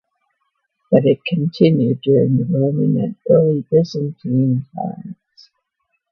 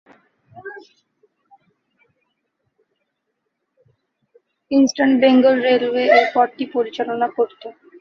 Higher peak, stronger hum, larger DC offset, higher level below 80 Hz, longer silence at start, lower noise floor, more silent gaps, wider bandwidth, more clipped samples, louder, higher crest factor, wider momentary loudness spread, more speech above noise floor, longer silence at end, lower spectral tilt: about the same, 0 dBFS vs -2 dBFS; neither; neither; first, -58 dBFS vs -68 dBFS; first, 0.9 s vs 0.55 s; about the same, -72 dBFS vs -75 dBFS; neither; about the same, 6.4 kHz vs 6.8 kHz; neither; about the same, -17 LUFS vs -17 LUFS; about the same, 18 dB vs 18 dB; second, 11 LU vs 24 LU; about the same, 56 dB vs 59 dB; first, 1 s vs 0.3 s; first, -9.5 dB/octave vs -4 dB/octave